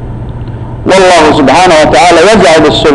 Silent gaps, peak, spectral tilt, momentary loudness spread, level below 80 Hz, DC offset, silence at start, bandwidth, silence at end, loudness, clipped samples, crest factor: none; 0 dBFS; -4.5 dB/octave; 17 LU; -26 dBFS; under 0.1%; 0 s; 11 kHz; 0 s; -3 LUFS; under 0.1%; 4 dB